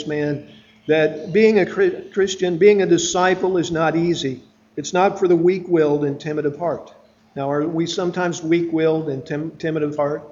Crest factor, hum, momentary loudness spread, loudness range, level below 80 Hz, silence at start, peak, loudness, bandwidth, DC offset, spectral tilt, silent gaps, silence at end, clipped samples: 18 dB; none; 11 LU; 5 LU; -58 dBFS; 0 s; -2 dBFS; -19 LUFS; 7.6 kHz; under 0.1%; -5.5 dB/octave; none; 0.05 s; under 0.1%